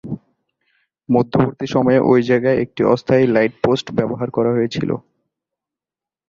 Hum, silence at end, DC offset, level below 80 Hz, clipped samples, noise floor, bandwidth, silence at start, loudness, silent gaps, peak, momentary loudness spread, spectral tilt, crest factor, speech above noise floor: none; 1.3 s; under 0.1%; -52 dBFS; under 0.1%; -89 dBFS; 7.4 kHz; 0.05 s; -17 LUFS; none; -2 dBFS; 8 LU; -7.5 dB/octave; 16 dB; 73 dB